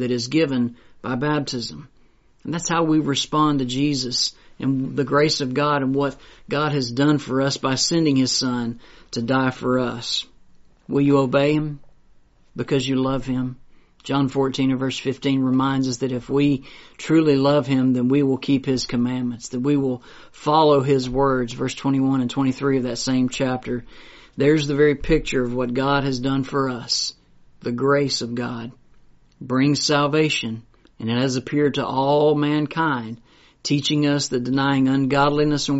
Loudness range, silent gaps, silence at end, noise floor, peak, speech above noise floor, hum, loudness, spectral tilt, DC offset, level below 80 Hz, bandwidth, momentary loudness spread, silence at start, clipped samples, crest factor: 3 LU; none; 0 s; -54 dBFS; -4 dBFS; 34 dB; none; -21 LUFS; -5 dB/octave; under 0.1%; -46 dBFS; 8 kHz; 11 LU; 0 s; under 0.1%; 16 dB